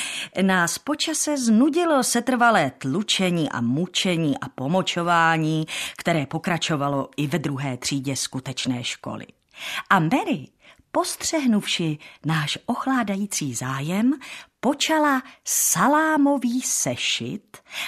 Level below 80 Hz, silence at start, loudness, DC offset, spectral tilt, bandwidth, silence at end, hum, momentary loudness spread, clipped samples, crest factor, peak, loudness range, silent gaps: -64 dBFS; 0 s; -22 LUFS; under 0.1%; -3.5 dB/octave; 14 kHz; 0 s; none; 10 LU; under 0.1%; 20 dB; -4 dBFS; 5 LU; none